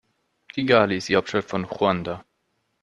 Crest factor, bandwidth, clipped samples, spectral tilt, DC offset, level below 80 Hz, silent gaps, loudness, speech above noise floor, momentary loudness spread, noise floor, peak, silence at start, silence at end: 22 dB; 10.5 kHz; under 0.1%; -5.5 dB/octave; under 0.1%; -60 dBFS; none; -22 LUFS; 51 dB; 15 LU; -73 dBFS; -2 dBFS; 0.55 s; 0.6 s